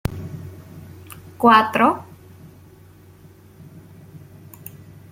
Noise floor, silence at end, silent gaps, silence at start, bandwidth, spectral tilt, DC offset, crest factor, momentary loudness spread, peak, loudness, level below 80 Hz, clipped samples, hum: -47 dBFS; 0.95 s; none; 0.1 s; 16.5 kHz; -6 dB/octave; under 0.1%; 22 dB; 27 LU; -2 dBFS; -17 LUFS; -48 dBFS; under 0.1%; none